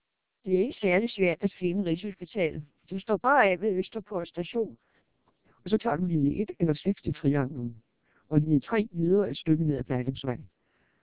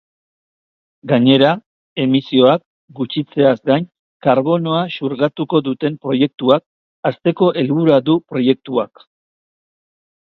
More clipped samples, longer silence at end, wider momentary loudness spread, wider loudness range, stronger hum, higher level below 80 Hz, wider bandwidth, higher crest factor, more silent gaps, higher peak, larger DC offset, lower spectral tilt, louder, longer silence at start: neither; second, 0.6 s vs 1.5 s; about the same, 11 LU vs 10 LU; about the same, 3 LU vs 2 LU; neither; first, -56 dBFS vs -62 dBFS; second, 4 kHz vs 4.9 kHz; about the same, 20 dB vs 16 dB; second, none vs 1.66-1.96 s, 2.66-2.88 s, 3.99-4.20 s, 6.66-7.03 s; second, -8 dBFS vs 0 dBFS; first, 0.1% vs under 0.1%; first, -11 dB/octave vs -9 dB/octave; second, -28 LUFS vs -16 LUFS; second, 0.45 s vs 1.05 s